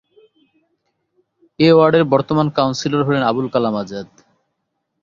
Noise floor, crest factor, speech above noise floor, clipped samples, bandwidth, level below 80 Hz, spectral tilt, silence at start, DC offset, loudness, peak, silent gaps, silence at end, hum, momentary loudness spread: -73 dBFS; 16 dB; 58 dB; under 0.1%; 7.4 kHz; -56 dBFS; -6.5 dB/octave; 1.6 s; under 0.1%; -16 LUFS; -2 dBFS; none; 1 s; none; 11 LU